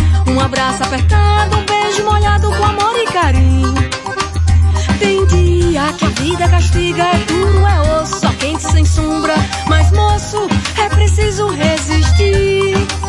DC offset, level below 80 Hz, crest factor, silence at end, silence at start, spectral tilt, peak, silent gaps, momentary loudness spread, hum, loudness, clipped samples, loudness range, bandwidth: under 0.1%; -22 dBFS; 12 dB; 0 s; 0 s; -5.5 dB/octave; 0 dBFS; none; 4 LU; none; -13 LUFS; under 0.1%; 1 LU; 11.5 kHz